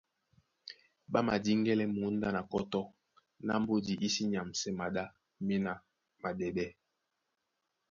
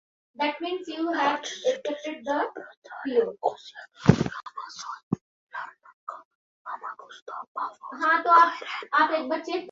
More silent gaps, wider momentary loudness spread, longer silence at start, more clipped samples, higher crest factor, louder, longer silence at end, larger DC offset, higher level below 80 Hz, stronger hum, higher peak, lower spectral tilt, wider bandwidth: second, none vs 2.77-2.82 s, 5.03-5.11 s, 5.21-5.47 s, 5.94-6.07 s, 6.25-6.65 s, 7.22-7.26 s, 7.47-7.55 s; second, 16 LU vs 19 LU; first, 0.65 s vs 0.4 s; neither; second, 20 dB vs 26 dB; second, -35 LUFS vs -26 LUFS; first, 1.2 s vs 0 s; neither; second, -66 dBFS vs -56 dBFS; neither; second, -16 dBFS vs -2 dBFS; about the same, -5 dB/octave vs -5.5 dB/octave; about the same, 7.6 kHz vs 7.8 kHz